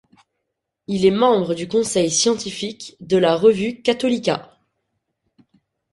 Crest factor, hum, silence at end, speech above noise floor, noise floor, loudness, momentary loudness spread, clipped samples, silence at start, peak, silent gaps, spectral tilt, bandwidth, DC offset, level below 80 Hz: 18 dB; none; 1.5 s; 60 dB; -78 dBFS; -19 LUFS; 12 LU; under 0.1%; 0.9 s; -4 dBFS; none; -4 dB/octave; 11.5 kHz; under 0.1%; -58 dBFS